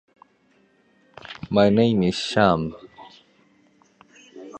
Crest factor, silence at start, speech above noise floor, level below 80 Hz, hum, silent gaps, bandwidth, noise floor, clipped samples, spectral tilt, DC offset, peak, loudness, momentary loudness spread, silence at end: 22 dB; 1.3 s; 42 dB; -52 dBFS; none; none; 9.2 kHz; -61 dBFS; under 0.1%; -6.5 dB/octave; under 0.1%; -2 dBFS; -20 LUFS; 26 LU; 0 s